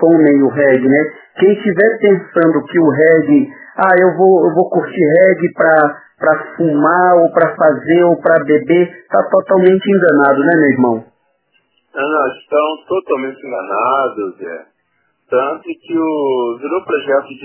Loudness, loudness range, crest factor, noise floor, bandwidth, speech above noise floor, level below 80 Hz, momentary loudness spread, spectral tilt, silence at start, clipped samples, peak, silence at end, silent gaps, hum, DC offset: -12 LUFS; 7 LU; 12 dB; -63 dBFS; 4 kHz; 51 dB; -64 dBFS; 10 LU; -10.5 dB/octave; 0 s; under 0.1%; 0 dBFS; 0.05 s; none; none; under 0.1%